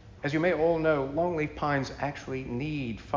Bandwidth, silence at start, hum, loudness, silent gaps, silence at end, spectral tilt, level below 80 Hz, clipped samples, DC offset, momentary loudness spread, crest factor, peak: 7.6 kHz; 0.05 s; none; -29 LUFS; none; 0 s; -7 dB/octave; -50 dBFS; under 0.1%; under 0.1%; 9 LU; 16 dB; -12 dBFS